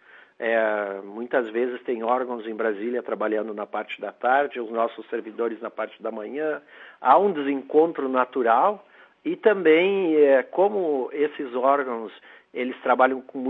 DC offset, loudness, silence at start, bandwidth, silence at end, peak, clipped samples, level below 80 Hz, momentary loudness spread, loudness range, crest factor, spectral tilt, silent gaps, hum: under 0.1%; -24 LUFS; 0.4 s; 4.1 kHz; 0 s; -4 dBFS; under 0.1%; -86 dBFS; 13 LU; 6 LU; 20 dB; -8 dB/octave; none; none